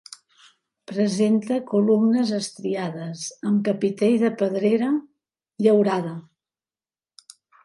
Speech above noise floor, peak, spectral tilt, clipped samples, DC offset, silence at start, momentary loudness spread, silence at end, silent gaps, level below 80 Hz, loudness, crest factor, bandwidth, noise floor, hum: over 69 dB; -6 dBFS; -6 dB/octave; under 0.1%; under 0.1%; 0.9 s; 12 LU; 1.45 s; none; -72 dBFS; -22 LUFS; 18 dB; 11.5 kHz; under -90 dBFS; none